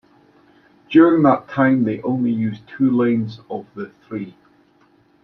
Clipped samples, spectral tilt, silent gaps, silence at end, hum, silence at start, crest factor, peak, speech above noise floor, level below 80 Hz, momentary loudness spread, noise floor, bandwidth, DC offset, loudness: under 0.1%; -9.5 dB/octave; none; 0.95 s; none; 0.9 s; 18 dB; -2 dBFS; 39 dB; -62 dBFS; 18 LU; -56 dBFS; 5.6 kHz; under 0.1%; -18 LUFS